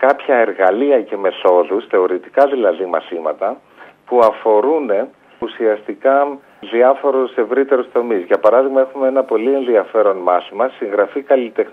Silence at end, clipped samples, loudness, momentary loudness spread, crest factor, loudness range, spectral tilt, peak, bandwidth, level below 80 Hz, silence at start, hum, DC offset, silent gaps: 0 s; under 0.1%; -15 LUFS; 8 LU; 14 dB; 2 LU; -6.5 dB/octave; 0 dBFS; 4.8 kHz; -68 dBFS; 0 s; none; under 0.1%; none